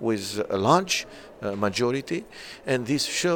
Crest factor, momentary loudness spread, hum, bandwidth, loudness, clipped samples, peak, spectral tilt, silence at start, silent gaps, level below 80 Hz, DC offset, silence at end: 20 dB; 14 LU; none; 17.5 kHz; -25 LUFS; under 0.1%; -6 dBFS; -4 dB/octave; 0 s; none; -58 dBFS; under 0.1%; 0 s